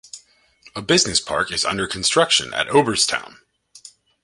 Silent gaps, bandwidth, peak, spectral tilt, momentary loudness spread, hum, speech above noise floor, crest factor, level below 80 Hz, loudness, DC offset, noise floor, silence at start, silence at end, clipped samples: none; 11.5 kHz; -2 dBFS; -2 dB/octave; 12 LU; none; 33 dB; 20 dB; -52 dBFS; -18 LUFS; under 0.1%; -52 dBFS; 0.15 s; 0.35 s; under 0.1%